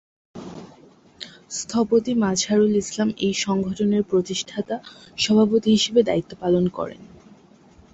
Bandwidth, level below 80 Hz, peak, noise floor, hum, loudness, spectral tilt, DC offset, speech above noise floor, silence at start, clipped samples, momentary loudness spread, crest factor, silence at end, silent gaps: 8.2 kHz; -56 dBFS; -6 dBFS; -51 dBFS; none; -21 LUFS; -4.5 dB/octave; under 0.1%; 30 dB; 0.35 s; under 0.1%; 21 LU; 18 dB; 0.9 s; none